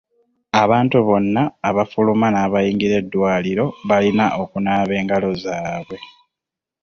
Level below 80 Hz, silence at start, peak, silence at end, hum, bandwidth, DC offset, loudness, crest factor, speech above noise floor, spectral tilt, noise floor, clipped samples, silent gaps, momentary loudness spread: -50 dBFS; 0.55 s; -2 dBFS; 0.75 s; none; 6.8 kHz; under 0.1%; -18 LUFS; 16 dB; 68 dB; -7 dB/octave; -85 dBFS; under 0.1%; none; 9 LU